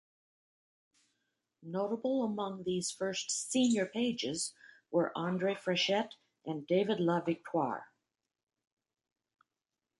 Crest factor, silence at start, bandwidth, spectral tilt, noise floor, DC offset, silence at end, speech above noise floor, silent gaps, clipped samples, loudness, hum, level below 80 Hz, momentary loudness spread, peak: 18 dB; 1.6 s; 11.5 kHz; -4 dB/octave; under -90 dBFS; under 0.1%; 2.15 s; over 57 dB; none; under 0.1%; -34 LUFS; none; -78 dBFS; 9 LU; -18 dBFS